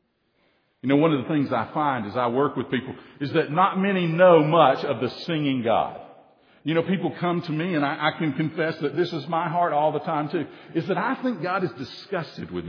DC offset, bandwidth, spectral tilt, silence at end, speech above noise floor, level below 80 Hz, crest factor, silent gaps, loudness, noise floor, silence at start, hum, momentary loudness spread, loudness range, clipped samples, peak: under 0.1%; 5.4 kHz; -8.5 dB/octave; 0 s; 44 dB; -68 dBFS; 20 dB; none; -24 LUFS; -67 dBFS; 0.85 s; none; 12 LU; 5 LU; under 0.1%; -4 dBFS